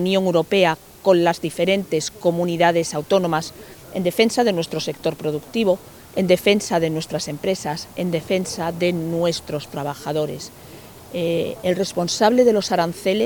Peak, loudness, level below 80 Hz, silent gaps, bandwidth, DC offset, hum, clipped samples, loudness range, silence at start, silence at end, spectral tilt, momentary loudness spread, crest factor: -2 dBFS; -21 LUFS; -56 dBFS; none; 19.5 kHz; under 0.1%; none; under 0.1%; 5 LU; 0 s; 0 s; -5 dB/octave; 11 LU; 18 dB